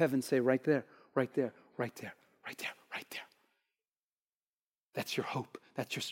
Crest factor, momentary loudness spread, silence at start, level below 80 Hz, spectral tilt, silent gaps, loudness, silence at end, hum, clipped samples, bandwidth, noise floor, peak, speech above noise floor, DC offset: 22 dB; 16 LU; 0 s; -90 dBFS; -5 dB/octave; 3.88-4.90 s; -37 LUFS; 0 s; none; under 0.1%; 16.5 kHz; under -90 dBFS; -16 dBFS; over 55 dB; under 0.1%